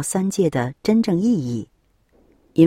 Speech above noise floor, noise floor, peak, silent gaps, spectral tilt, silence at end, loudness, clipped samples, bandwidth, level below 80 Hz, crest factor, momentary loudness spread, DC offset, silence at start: 39 dB; -59 dBFS; -2 dBFS; none; -6.5 dB/octave; 0 s; -21 LUFS; under 0.1%; 15.5 kHz; -56 dBFS; 18 dB; 10 LU; under 0.1%; 0 s